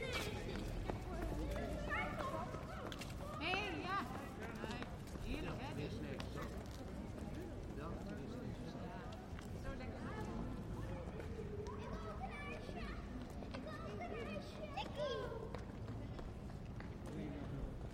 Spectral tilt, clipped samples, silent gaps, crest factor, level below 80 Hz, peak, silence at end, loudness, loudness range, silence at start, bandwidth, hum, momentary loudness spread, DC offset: -6 dB/octave; under 0.1%; none; 22 dB; -52 dBFS; -24 dBFS; 0 s; -47 LUFS; 5 LU; 0 s; 16 kHz; none; 7 LU; under 0.1%